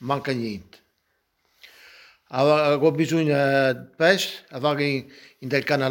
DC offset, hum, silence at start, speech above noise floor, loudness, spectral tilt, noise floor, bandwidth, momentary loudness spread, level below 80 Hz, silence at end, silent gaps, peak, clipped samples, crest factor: under 0.1%; none; 0 s; 50 dB; -22 LUFS; -5.5 dB/octave; -72 dBFS; 17 kHz; 11 LU; -66 dBFS; 0 s; none; -4 dBFS; under 0.1%; 20 dB